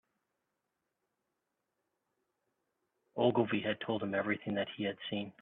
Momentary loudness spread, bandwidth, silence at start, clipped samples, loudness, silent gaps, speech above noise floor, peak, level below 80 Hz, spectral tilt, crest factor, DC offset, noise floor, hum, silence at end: 9 LU; 4.1 kHz; 3.15 s; under 0.1%; -35 LUFS; none; 52 dB; -16 dBFS; -76 dBFS; -9 dB/octave; 22 dB; under 0.1%; -86 dBFS; none; 0.1 s